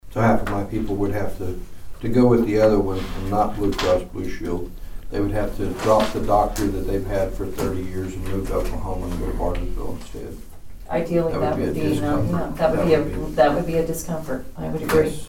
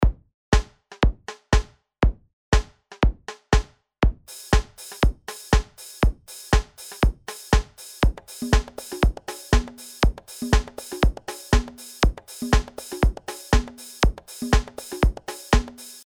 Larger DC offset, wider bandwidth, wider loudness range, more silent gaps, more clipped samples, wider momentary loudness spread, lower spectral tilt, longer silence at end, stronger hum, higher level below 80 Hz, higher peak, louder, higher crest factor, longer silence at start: neither; about the same, 17.5 kHz vs 16 kHz; first, 6 LU vs 1 LU; second, none vs 0.34-0.52 s, 2.33-2.52 s; neither; about the same, 13 LU vs 14 LU; first, -6.5 dB/octave vs -5 dB/octave; about the same, 0 s vs 0.1 s; neither; second, -32 dBFS vs -24 dBFS; about the same, -4 dBFS vs -4 dBFS; about the same, -23 LUFS vs -25 LUFS; about the same, 18 dB vs 20 dB; about the same, 0.05 s vs 0 s